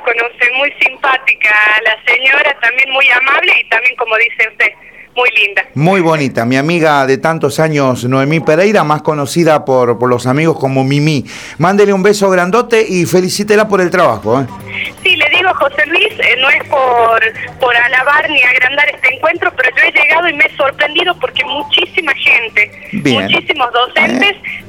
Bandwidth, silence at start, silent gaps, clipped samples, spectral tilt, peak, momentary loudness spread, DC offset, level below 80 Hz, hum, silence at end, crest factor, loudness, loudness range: 19.5 kHz; 0 s; none; under 0.1%; -4.5 dB/octave; 0 dBFS; 6 LU; 0.2%; -52 dBFS; none; 0 s; 12 dB; -10 LUFS; 3 LU